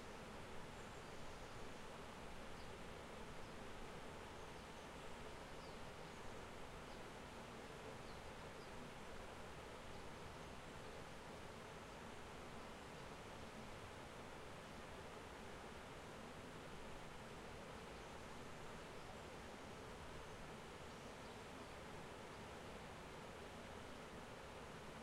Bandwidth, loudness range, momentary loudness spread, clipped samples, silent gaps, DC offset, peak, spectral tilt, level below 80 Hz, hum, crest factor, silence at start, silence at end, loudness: 16 kHz; 0 LU; 1 LU; under 0.1%; none; under 0.1%; -40 dBFS; -4.5 dB/octave; -64 dBFS; none; 14 dB; 0 s; 0 s; -55 LUFS